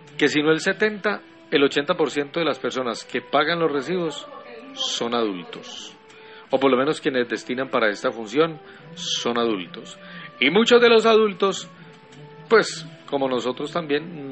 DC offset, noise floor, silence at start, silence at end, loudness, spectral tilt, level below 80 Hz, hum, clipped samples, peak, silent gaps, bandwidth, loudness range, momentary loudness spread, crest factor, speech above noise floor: under 0.1%; -45 dBFS; 0.15 s; 0 s; -22 LUFS; -4 dB/octave; -68 dBFS; none; under 0.1%; -4 dBFS; none; 8.4 kHz; 6 LU; 18 LU; 20 dB; 23 dB